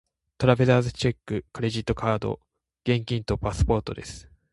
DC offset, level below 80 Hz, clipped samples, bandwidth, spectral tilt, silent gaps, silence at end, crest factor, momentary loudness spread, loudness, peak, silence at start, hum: under 0.1%; -38 dBFS; under 0.1%; 11.5 kHz; -6.5 dB/octave; none; 0.3 s; 22 dB; 15 LU; -25 LUFS; -4 dBFS; 0.4 s; none